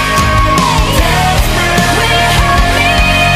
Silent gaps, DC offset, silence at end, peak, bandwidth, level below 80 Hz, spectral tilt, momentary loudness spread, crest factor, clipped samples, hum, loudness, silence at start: none; under 0.1%; 0 s; 0 dBFS; 16 kHz; -16 dBFS; -4 dB/octave; 2 LU; 10 dB; under 0.1%; none; -9 LUFS; 0 s